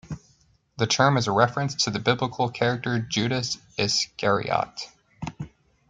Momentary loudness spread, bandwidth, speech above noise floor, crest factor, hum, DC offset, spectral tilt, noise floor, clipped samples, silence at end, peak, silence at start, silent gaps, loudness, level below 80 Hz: 18 LU; 9.4 kHz; 38 dB; 22 dB; none; under 0.1%; -4 dB/octave; -62 dBFS; under 0.1%; 0.45 s; -4 dBFS; 0.05 s; none; -24 LUFS; -58 dBFS